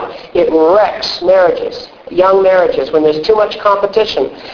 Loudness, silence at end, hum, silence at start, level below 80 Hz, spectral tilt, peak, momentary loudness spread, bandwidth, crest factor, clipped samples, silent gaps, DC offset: -11 LUFS; 0 s; none; 0 s; -44 dBFS; -5 dB/octave; 0 dBFS; 9 LU; 5.4 kHz; 12 dB; under 0.1%; none; under 0.1%